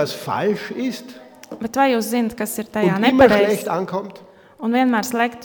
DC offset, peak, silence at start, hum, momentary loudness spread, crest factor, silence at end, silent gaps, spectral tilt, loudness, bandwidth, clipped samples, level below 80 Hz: under 0.1%; 0 dBFS; 0 s; none; 15 LU; 20 dB; 0 s; none; -5 dB/octave; -19 LUFS; 19.5 kHz; under 0.1%; -52 dBFS